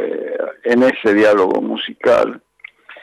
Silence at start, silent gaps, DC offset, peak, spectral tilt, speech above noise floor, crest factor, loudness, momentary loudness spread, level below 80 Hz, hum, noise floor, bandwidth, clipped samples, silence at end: 0 s; none; under 0.1%; -4 dBFS; -5.5 dB/octave; 27 dB; 12 dB; -15 LUFS; 10 LU; -58 dBFS; none; -41 dBFS; 12 kHz; under 0.1%; 0 s